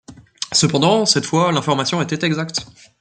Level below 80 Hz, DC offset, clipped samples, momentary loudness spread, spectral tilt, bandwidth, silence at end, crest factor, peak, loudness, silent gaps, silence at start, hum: -56 dBFS; under 0.1%; under 0.1%; 9 LU; -4 dB/octave; 9.6 kHz; 0.3 s; 18 dB; 0 dBFS; -17 LUFS; none; 0.1 s; none